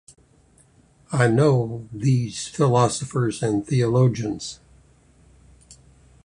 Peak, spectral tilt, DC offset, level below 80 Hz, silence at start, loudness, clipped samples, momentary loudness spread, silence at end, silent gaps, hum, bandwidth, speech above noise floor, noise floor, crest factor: -4 dBFS; -6.5 dB/octave; under 0.1%; -54 dBFS; 1.1 s; -22 LUFS; under 0.1%; 11 LU; 0.55 s; none; none; 11 kHz; 36 dB; -56 dBFS; 20 dB